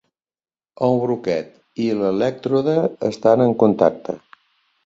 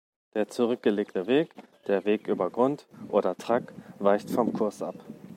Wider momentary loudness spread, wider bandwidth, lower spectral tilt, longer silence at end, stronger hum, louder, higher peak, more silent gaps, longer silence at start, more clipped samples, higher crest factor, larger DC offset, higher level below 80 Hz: about the same, 12 LU vs 12 LU; second, 7.8 kHz vs 16 kHz; first, -8 dB/octave vs -6.5 dB/octave; first, 0.7 s vs 0 s; neither; first, -19 LUFS vs -28 LUFS; first, 0 dBFS vs -8 dBFS; neither; first, 0.8 s vs 0.35 s; neither; about the same, 20 dB vs 20 dB; neither; first, -60 dBFS vs -74 dBFS